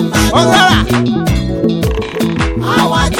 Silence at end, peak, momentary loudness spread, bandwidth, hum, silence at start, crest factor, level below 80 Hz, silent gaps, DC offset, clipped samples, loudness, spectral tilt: 0 s; 0 dBFS; 8 LU; 17 kHz; none; 0 s; 12 dB; -22 dBFS; none; under 0.1%; under 0.1%; -12 LUFS; -5 dB/octave